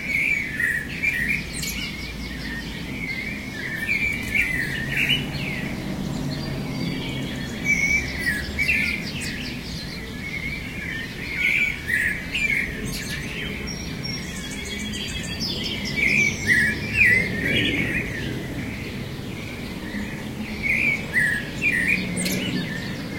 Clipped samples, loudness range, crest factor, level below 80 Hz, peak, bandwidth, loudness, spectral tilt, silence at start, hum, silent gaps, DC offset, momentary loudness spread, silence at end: under 0.1%; 6 LU; 20 dB; -40 dBFS; -6 dBFS; 16.5 kHz; -23 LUFS; -3.5 dB/octave; 0 s; none; none; 0.1%; 12 LU; 0 s